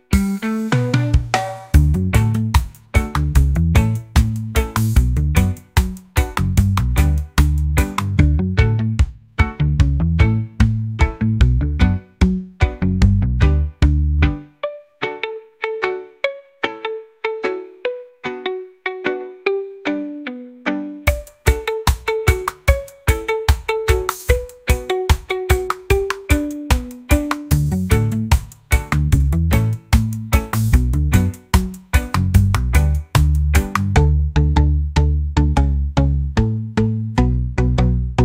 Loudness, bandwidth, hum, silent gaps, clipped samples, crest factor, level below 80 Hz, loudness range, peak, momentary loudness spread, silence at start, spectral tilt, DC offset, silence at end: -19 LUFS; 16.5 kHz; none; none; under 0.1%; 16 dB; -22 dBFS; 7 LU; 0 dBFS; 8 LU; 0.1 s; -6.5 dB/octave; under 0.1%; 0 s